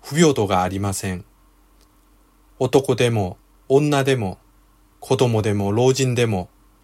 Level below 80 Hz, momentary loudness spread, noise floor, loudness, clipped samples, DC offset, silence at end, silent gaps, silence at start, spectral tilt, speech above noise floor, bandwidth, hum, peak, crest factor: -52 dBFS; 11 LU; -55 dBFS; -20 LUFS; under 0.1%; under 0.1%; 0.35 s; none; 0.05 s; -5.5 dB/octave; 36 dB; 16 kHz; none; -2 dBFS; 18 dB